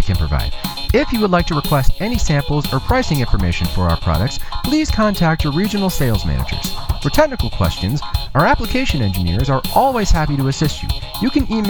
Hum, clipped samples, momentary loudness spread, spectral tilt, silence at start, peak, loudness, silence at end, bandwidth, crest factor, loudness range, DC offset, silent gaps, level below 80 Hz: none; under 0.1%; 6 LU; -5.5 dB/octave; 0 s; 0 dBFS; -18 LUFS; 0 s; over 20 kHz; 16 dB; 1 LU; under 0.1%; none; -22 dBFS